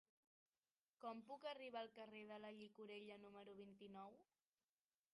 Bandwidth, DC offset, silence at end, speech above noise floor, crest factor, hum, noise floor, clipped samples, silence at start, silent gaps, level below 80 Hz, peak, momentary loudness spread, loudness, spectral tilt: 11 kHz; under 0.1%; 0.9 s; over 32 dB; 18 dB; none; under -90 dBFS; under 0.1%; 1 s; none; under -90 dBFS; -40 dBFS; 8 LU; -58 LUFS; -5.5 dB/octave